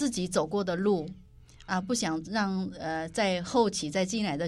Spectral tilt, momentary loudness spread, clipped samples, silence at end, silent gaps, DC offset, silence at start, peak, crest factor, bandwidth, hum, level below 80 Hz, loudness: -4.5 dB/octave; 7 LU; under 0.1%; 0 s; none; under 0.1%; 0 s; -14 dBFS; 16 dB; 14 kHz; none; -56 dBFS; -30 LUFS